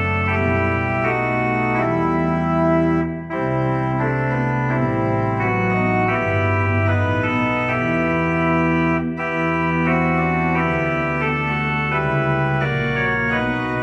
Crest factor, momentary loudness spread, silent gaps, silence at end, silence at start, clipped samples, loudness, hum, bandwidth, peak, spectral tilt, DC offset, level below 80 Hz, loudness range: 14 dB; 2 LU; none; 0 s; 0 s; under 0.1%; -19 LUFS; none; 8 kHz; -6 dBFS; -8.5 dB/octave; under 0.1%; -40 dBFS; 1 LU